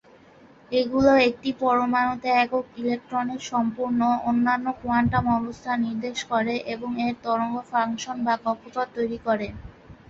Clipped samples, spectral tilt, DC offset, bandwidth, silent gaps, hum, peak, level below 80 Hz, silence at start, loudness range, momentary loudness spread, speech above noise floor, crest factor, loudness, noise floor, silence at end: under 0.1%; -5.5 dB/octave; under 0.1%; 7.6 kHz; none; none; -6 dBFS; -52 dBFS; 0.7 s; 4 LU; 8 LU; 28 dB; 18 dB; -24 LUFS; -52 dBFS; 0.15 s